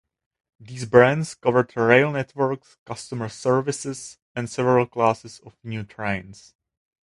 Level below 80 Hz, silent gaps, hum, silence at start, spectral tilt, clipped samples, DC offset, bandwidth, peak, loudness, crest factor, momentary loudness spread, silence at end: -58 dBFS; 2.79-2.86 s, 4.22-4.35 s; none; 0.6 s; -6 dB/octave; under 0.1%; under 0.1%; 11.5 kHz; 0 dBFS; -22 LUFS; 22 dB; 18 LU; 0.75 s